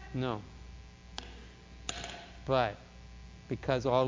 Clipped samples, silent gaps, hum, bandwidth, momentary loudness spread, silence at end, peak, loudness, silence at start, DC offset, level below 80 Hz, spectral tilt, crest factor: under 0.1%; none; none; 7.6 kHz; 21 LU; 0 s; -14 dBFS; -36 LUFS; 0 s; under 0.1%; -52 dBFS; -5.5 dB/octave; 22 dB